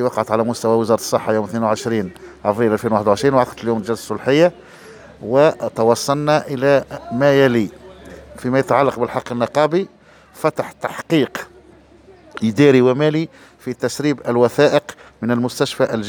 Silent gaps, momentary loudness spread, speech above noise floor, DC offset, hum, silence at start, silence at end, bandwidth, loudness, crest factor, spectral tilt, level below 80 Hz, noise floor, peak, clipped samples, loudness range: none; 13 LU; 29 dB; under 0.1%; none; 0 s; 0 s; over 20 kHz; -17 LUFS; 18 dB; -6 dB/octave; -54 dBFS; -46 dBFS; 0 dBFS; under 0.1%; 3 LU